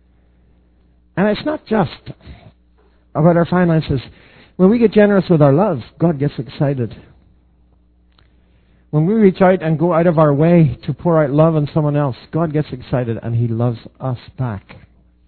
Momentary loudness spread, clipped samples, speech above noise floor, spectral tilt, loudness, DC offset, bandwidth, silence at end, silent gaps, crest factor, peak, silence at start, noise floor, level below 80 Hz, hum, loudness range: 13 LU; under 0.1%; 38 dB; -12.5 dB/octave; -16 LUFS; under 0.1%; 4.5 kHz; 0.7 s; none; 16 dB; 0 dBFS; 1.15 s; -53 dBFS; -44 dBFS; none; 7 LU